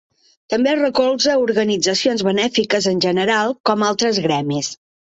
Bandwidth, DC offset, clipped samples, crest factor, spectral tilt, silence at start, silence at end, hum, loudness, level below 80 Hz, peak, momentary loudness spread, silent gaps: 8.2 kHz; under 0.1%; under 0.1%; 16 dB; -4 dB/octave; 0.5 s; 0.35 s; none; -17 LUFS; -60 dBFS; -2 dBFS; 4 LU; 3.60-3.64 s